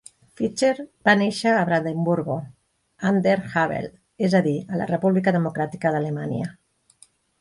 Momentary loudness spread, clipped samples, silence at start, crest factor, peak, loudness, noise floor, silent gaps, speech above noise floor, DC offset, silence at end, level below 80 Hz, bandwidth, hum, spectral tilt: 10 LU; under 0.1%; 0.4 s; 20 dB; -4 dBFS; -23 LUFS; -57 dBFS; none; 35 dB; under 0.1%; 0.9 s; -62 dBFS; 11.5 kHz; none; -6.5 dB/octave